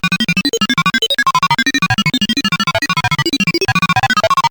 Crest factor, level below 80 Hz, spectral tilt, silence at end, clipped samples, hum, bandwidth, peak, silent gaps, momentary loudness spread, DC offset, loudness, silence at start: 10 dB; -42 dBFS; -3.5 dB/octave; 0 s; under 0.1%; none; over 20 kHz; -4 dBFS; none; 2 LU; under 0.1%; -13 LUFS; 0.05 s